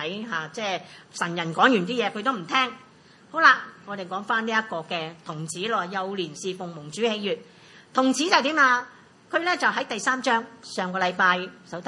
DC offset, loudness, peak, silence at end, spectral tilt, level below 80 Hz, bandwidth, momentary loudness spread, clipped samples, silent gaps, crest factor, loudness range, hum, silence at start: under 0.1%; -24 LUFS; -2 dBFS; 0 s; -3.5 dB/octave; -78 dBFS; 11.5 kHz; 14 LU; under 0.1%; none; 24 dB; 6 LU; none; 0 s